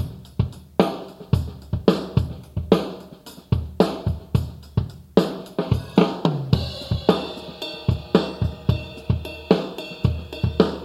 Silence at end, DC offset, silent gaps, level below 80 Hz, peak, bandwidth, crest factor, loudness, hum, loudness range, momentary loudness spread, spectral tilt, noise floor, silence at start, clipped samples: 0 s; under 0.1%; none; -36 dBFS; -2 dBFS; 15.5 kHz; 22 dB; -24 LUFS; none; 2 LU; 10 LU; -7.5 dB/octave; -43 dBFS; 0 s; under 0.1%